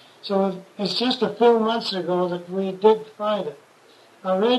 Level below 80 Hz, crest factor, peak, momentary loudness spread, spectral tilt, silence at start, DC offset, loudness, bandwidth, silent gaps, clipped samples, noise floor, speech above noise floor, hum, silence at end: -74 dBFS; 18 dB; -4 dBFS; 10 LU; -6 dB/octave; 0.25 s; under 0.1%; -22 LUFS; 12 kHz; none; under 0.1%; -52 dBFS; 31 dB; none; 0 s